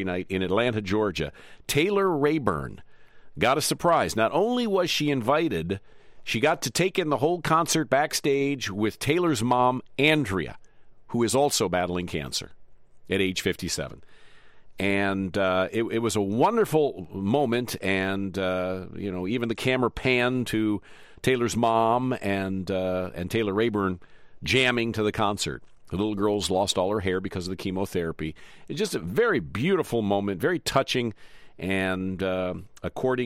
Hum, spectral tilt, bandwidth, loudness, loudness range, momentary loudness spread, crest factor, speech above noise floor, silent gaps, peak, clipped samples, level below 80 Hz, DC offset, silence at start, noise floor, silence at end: none; -4.5 dB/octave; 16 kHz; -25 LUFS; 3 LU; 9 LU; 18 dB; 21 dB; none; -8 dBFS; under 0.1%; -52 dBFS; under 0.1%; 0 s; -47 dBFS; 0 s